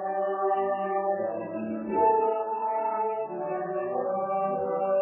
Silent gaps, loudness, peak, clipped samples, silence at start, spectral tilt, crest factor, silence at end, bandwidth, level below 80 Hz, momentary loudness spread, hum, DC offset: none; -28 LUFS; -12 dBFS; under 0.1%; 0 s; -6.5 dB/octave; 14 dB; 0 s; 3.1 kHz; -68 dBFS; 8 LU; none; under 0.1%